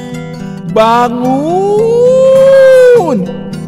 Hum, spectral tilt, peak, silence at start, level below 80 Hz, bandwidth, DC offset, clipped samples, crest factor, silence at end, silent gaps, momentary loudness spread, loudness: none; -6.5 dB/octave; 0 dBFS; 0 s; -44 dBFS; 12.5 kHz; under 0.1%; under 0.1%; 8 dB; 0 s; none; 18 LU; -7 LUFS